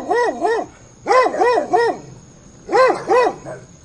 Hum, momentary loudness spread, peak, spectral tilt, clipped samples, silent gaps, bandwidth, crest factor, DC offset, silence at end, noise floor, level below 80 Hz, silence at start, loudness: none; 17 LU; -2 dBFS; -4 dB/octave; under 0.1%; none; 11 kHz; 16 dB; under 0.1%; 0.2 s; -43 dBFS; -54 dBFS; 0 s; -17 LUFS